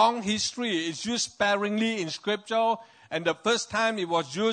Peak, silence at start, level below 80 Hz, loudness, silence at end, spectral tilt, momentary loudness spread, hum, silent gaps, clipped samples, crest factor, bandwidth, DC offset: -10 dBFS; 0 s; -68 dBFS; -27 LUFS; 0 s; -3 dB/octave; 5 LU; none; none; under 0.1%; 18 dB; 9.6 kHz; under 0.1%